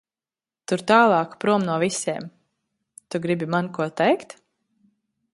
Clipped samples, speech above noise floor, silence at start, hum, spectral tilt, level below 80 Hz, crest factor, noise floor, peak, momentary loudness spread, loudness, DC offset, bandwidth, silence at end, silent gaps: under 0.1%; over 69 dB; 0.7 s; none; -5 dB/octave; -68 dBFS; 22 dB; under -90 dBFS; -2 dBFS; 14 LU; -22 LUFS; under 0.1%; 11.5 kHz; 1.1 s; none